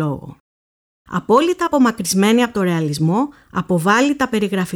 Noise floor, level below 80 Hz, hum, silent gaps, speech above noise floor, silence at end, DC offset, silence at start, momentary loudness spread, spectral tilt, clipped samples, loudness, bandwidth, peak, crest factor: under -90 dBFS; -52 dBFS; none; 0.40-1.05 s; over 73 dB; 0 s; under 0.1%; 0 s; 10 LU; -5.5 dB/octave; under 0.1%; -17 LUFS; 18.5 kHz; -4 dBFS; 14 dB